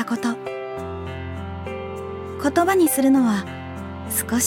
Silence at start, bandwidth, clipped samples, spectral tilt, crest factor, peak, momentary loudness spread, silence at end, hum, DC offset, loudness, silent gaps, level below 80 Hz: 0 s; 18 kHz; under 0.1%; -4.5 dB/octave; 16 dB; -6 dBFS; 15 LU; 0 s; none; under 0.1%; -23 LUFS; none; -46 dBFS